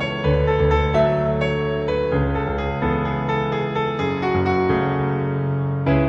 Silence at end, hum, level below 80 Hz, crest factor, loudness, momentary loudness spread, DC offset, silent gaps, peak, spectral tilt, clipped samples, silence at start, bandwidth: 0 s; none; -30 dBFS; 14 dB; -21 LUFS; 5 LU; under 0.1%; none; -6 dBFS; -8.5 dB/octave; under 0.1%; 0 s; 7 kHz